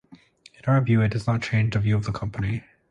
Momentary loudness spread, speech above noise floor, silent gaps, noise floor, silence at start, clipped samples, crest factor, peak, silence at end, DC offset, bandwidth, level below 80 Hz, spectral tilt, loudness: 9 LU; 30 dB; none; -52 dBFS; 0.1 s; under 0.1%; 14 dB; -8 dBFS; 0.3 s; under 0.1%; 9.4 kHz; -46 dBFS; -7.5 dB/octave; -24 LUFS